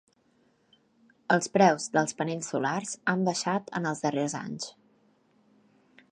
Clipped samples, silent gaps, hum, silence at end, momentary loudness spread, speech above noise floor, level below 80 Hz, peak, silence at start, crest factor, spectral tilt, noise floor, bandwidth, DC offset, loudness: under 0.1%; none; none; 1.4 s; 13 LU; 40 dB; -76 dBFS; -8 dBFS; 1.3 s; 22 dB; -4.5 dB/octave; -67 dBFS; 10.5 kHz; under 0.1%; -28 LUFS